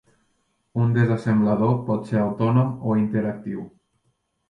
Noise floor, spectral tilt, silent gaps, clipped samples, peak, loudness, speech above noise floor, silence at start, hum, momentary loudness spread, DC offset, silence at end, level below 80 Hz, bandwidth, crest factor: -71 dBFS; -10 dB/octave; none; under 0.1%; -6 dBFS; -22 LUFS; 50 dB; 0.75 s; none; 12 LU; under 0.1%; 0.8 s; -58 dBFS; 7 kHz; 16 dB